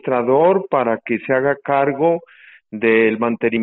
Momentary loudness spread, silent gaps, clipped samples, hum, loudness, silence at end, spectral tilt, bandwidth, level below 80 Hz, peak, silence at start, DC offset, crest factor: 6 LU; none; under 0.1%; none; -17 LUFS; 0 s; -5 dB/octave; 4.1 kHz; -60 dBFS; -2 dBFS; 0.05 s; under 0.1%; 14 dB